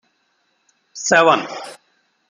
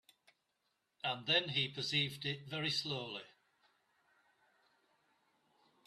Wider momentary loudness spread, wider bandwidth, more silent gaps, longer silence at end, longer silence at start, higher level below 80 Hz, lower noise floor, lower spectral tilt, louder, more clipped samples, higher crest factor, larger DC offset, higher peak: first, 24 LU vs 10 LU; second, 11 kHz vs 13.5 kHz; neither; second, 0.55 s vs 2.55 s; about the same, 0.95 s vs 1.05 s; first, -68 dBFS vs -80 dBFS; second, -66 dBFS vs -83 dBFS; about the same, -2.5 dB/octave vs -3.5 dB/octave; first, -15 LUFS vs -36 LUFS; neither; about the same, 20 dB vs 24 dB; neither; first, -2 dBFS vs -20 dBFS